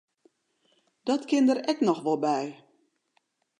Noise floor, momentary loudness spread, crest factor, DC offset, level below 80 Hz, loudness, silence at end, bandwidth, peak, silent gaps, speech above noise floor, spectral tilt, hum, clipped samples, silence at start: -73 dBFS; 9 LU; 18 dB; under 0.1%; -84 dBFS; -26 LUFS; 1.05 s; 10.5 kHz; -10 dBFS; none; 48 dB; -5 dB/octave; none; under 0.1%; 1.05 s